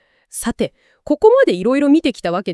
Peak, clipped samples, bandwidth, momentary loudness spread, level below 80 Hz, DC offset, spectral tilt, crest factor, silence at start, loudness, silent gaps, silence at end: 0 dBFS; under 0.1%; 12 kHz; 13 LU; -48 dBFS; under 0.1%; -5 dB/octave; 16 dB; 0.35 s; -16 LUFS; none; 0 s